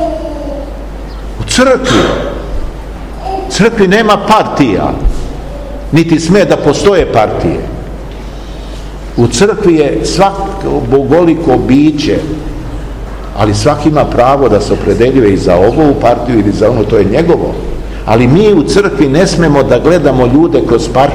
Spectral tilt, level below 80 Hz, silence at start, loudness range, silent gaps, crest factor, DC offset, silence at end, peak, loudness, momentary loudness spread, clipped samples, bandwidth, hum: -6 dB/octave; -22 dBFS; 0 s; 4 LU; none; 10 dB; under 0.1%; 0 s; 0 dBFS; -9 LUFS; 16 LU; 3%; 15.5 kHz; none